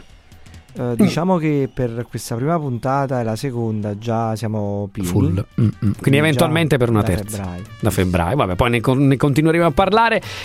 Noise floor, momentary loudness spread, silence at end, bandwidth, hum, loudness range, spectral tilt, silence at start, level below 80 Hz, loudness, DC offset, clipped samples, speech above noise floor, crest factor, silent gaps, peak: -42 dBFS; 9 LU; 0 s; 16 kHz; none; 4 LU; -6.5 dB/octave; 0.4 s; -40 dBFS; -18 LUFS; under 0.1%; under 0.1%; 25 dB; 18 dB; none; 0 dBFS